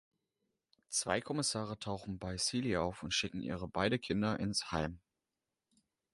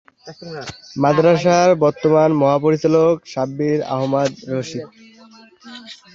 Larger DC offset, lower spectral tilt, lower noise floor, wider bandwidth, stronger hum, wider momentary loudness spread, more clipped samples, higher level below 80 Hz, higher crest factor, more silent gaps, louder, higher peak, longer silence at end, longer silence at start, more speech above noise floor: neither; second, -3.5 dB/octave vs -6.5 dB/octave; first, under -90 dBFS vs -46 dBFS; first, 11.5 kHz vs 7.6 kHz; neither; second, 7 LU vs 19 LU; neither; about the same, -58 dBFS vs -58 dBFS; first, 22 dB vs 16 dB; neither; second, -36 LUFS vs -16 LUFS; second, -16 dBFS vs -2 dBFS; first, 1.15 s vs 0.2 s; first, 0.9 s vs 0.25 s; first, over 53 dB vs 29 dB